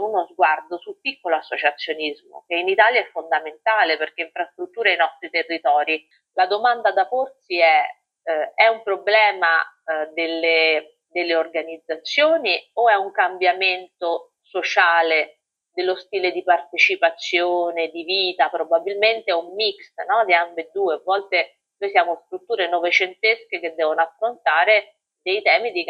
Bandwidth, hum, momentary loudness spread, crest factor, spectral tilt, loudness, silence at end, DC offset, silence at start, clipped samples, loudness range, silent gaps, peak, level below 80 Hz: 7.2 kHz; none; 11 LU; 20 dB; -2 dB/octave; -20 LUFS; 0 s; under 0.1%; 0 s; under 0.1%; 2 LU; none; 0 dBFS; -78 dBFS